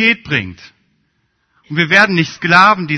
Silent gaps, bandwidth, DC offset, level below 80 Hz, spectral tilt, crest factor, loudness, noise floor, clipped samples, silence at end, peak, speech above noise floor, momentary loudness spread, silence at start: none; 11 kHz; under 0.1%; -52 dBFS; -5 dB/octave; 14 dB; -12 LUFS; -64 dBFS; 0.2%; 0 s; 0 dBFS; 51 dB; 12 LU; 0 s